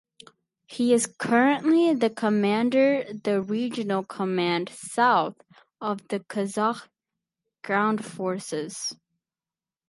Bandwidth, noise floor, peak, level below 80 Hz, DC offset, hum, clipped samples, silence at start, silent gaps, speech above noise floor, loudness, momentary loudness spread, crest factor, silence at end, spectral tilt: 11.5 kHz; under -90 dBFS; -6 dBFS; -76 dBFS; under 0.1%; none; under 0.1%; 0.7 s; none; over 66 dB; -25 LUFS; 11 LU; 20 dB; 0.95 s; -4.5 dB/octave